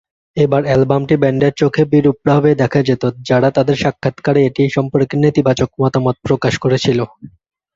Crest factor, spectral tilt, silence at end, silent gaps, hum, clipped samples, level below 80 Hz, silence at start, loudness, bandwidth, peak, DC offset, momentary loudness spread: 14 dB; -7 dB/octave; 0.5 s; none; none; under 0.1%; -46 dBFS; 0.35 s; -14 LUFS; 7.6 kHz; 0 dBFS; under 0.1%; 5 LU